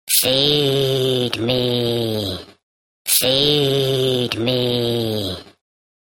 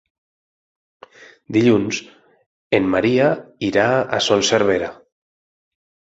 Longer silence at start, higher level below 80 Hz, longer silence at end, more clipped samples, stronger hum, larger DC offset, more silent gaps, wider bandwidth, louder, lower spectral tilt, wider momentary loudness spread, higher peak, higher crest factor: second, 0.05 s vs 1.5 s; about the same, -50 dBFS vs -54 dBFS; second, 0.55 s vs 1.2 s; neither; neither; neither; first, 2.63-3.05 s vs 2.46-2.71 s; first, 17.5 kHz vs 8.2 kHz; about the same, -18 LUFS vs -18 LUFS; about the same, -3.5 dB/octave vs -4.5 dB/octave; about the same, 10 LU vs 8 LU; about the same, -2 dBFS vs -2 dBFS; about the same, 18 dB vs 18 dB